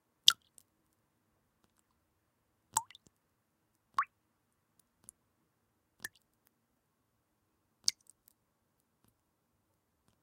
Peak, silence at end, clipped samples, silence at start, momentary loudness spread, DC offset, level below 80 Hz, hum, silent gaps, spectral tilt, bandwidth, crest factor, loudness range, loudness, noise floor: -2 dBFS; 6.2 s; under 0.1%; 0.25 s; 21 LU; under 0.1%; -86 dBFS; none; none; 3 dB/octave; 16 kHz; 40 dB; 12 LU; -33 LUFS; -80 dBFS